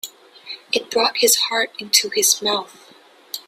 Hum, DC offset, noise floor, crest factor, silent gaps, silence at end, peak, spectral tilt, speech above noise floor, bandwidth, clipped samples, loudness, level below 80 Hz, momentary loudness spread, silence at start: none; under 0.1%; -49 dBFS; 22 dB; none; 0.05 s; 0 dBFS; 0.5 dB/octave; 30 dB; 16 kHz; under 0.1%; -17 LUFS; -70 dBFS; 19 LU; 0.05 s